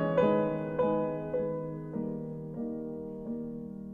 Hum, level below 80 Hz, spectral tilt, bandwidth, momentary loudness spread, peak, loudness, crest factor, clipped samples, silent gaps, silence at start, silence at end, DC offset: none; -60 dBFS; -10 dB/octave; 4.1 kHz; 12 LU; -14 dBFS; -33 LUFS; 18 dB; under 0.1%; none; 0 s; 0 s; under 0.1%